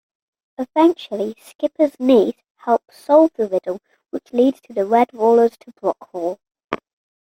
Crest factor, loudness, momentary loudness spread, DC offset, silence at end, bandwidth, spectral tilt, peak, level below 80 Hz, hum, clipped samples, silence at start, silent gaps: 18 dB; -18 LUFS; 15 LU; under 0.1%; 0.5 s; 16 kHz; -6.5 dB/octave; -2 dBFS; -68 dBFS; none; under 0.1%; 0.6 s; 1.55-1.59 s, 2.51-2.55 s, 6.64-6.68 s